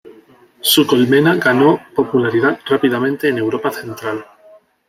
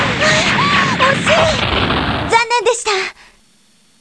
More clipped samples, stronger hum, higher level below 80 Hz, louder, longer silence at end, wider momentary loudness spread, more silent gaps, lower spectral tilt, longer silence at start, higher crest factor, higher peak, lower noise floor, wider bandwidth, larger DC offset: neither; neither; second, -60 dBFS vs -34 dBFS; about the same, -15 LUFS vs -13 LUFS; second, 0.65 s vs 0.9 s; first, 12 LU vs 5 LU; neither; about the same, -4.5 dB/octave vs -3.5 dB/octave; about the same, 0.05 s vs 0 s; about the same, 16 dB vs 14 dB; about the same, 0 dBFS vs 0 dBFS; second, -47 dBFS vs -53 dBFS; first, 16 kHz vs 11 kHz; second, under 0.1% vs 0.2%